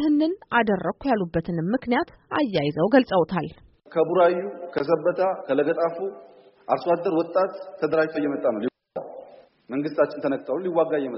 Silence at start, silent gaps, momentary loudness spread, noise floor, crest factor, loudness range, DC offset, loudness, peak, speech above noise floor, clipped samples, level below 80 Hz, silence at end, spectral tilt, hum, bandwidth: 0 s; none; 11 LU; -47 dBFS; 20 dB; 3 LU; under 0.1%; -24 LUFS; -4 dBFS; 24 dB; under 0.1%; -58 dBFS; 0 s; -5 dB/octave; none; 5.8 kHz